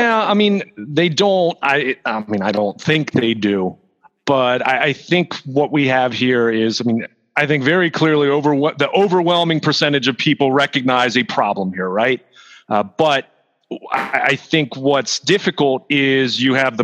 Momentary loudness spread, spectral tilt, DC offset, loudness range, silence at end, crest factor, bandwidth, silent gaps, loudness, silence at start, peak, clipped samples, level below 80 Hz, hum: 6 LU; -5 dB/octave; under 0.1%; 3 LU; 0 s; 16 dB; 10.5 kHz; none; -16 LUFS; 0 s; -2 dBFS; under 0.1%; -66 dBFS; none